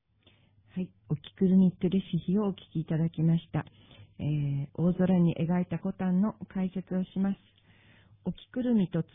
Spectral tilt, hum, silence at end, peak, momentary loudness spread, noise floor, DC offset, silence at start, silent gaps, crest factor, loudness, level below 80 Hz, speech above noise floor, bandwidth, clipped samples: -12 dB/octave; none; 0.1 s; -14 dBFS; 13 LU; -64 dBFS; under 0.1%; 0.75 s; none; 16 dB; -30 LUFS; -58 dBFS; 36 dB; 3.8 kHz; under 0.1%